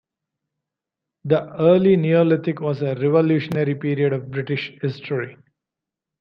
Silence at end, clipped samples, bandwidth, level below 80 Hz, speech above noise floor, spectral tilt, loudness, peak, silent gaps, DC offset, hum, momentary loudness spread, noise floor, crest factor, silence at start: 0.9 s; under 0.1%; 6 kHz; -64 dBFS; 67 dB; -9.5 dB/octave; -20 LUFS; -4 dBFS; none; under 0.1%; none; 11 LU; -86 dBFS; 18 dB; 1.25 s